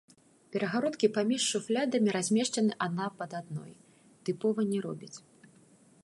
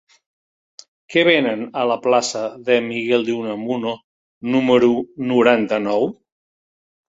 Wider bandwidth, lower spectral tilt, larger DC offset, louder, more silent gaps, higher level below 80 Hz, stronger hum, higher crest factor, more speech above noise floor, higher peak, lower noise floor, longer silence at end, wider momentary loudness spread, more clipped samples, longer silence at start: first, 11.5 kHz vs 8 kHz; about the same, -4.5 dB/octave vs -4.5 dB/octave; neither; second, -31 LUFS vs -18 LUFS; second, none vs 4.04-4.41 s; second, -80 dBFS vs -64 dBFS; neither; about the same, 20 dB vs 18 dB; second, 30 dB vs over 72 dB; second, -12 dBFS vs 0 dBFS; second, -61 dBFS vs under -90 dBFS; second, 0.85 s vs 1.05 s; first, 13 LU vs 9 LU; neither; second, 0.5 s vs 1.1 s